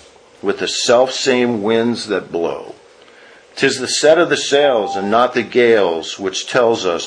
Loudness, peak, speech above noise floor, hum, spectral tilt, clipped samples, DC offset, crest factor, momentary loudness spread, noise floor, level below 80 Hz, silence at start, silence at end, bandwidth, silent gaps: -15 LUFS; 0 dBFS; 29 dB; none; -3 dB/octave; under 0.1%; under 0.1%; 16 dB; 9 LU; -44 dBFS; -60 dBFS; 0.45 s; 0 s; 10.5 kHz; none